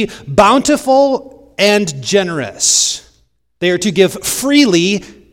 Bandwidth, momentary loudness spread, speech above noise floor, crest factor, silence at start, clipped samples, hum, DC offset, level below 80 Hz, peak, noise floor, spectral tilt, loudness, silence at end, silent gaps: 17 kHz; 9 LU; 45 dB; 14 dB; 0 s; 0.2%; none; under 0.1%; -44 dBFS; 0 dBFS; -58 dBFS; -3 dB/octave; -12 LUFS; 0.2 s; none